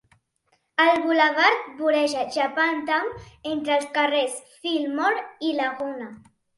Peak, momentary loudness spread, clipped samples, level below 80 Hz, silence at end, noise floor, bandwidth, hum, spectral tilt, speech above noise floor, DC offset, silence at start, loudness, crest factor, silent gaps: -6 dBFS; 12 LU; under 0.1%; -64 dBFS; 0.4 s; -69 dBFS; 11.5 kHz; none; -2.5 dB/octave; 46 dB; under 0.1%; 0.8 s; -23 LUFS; 18 dB; none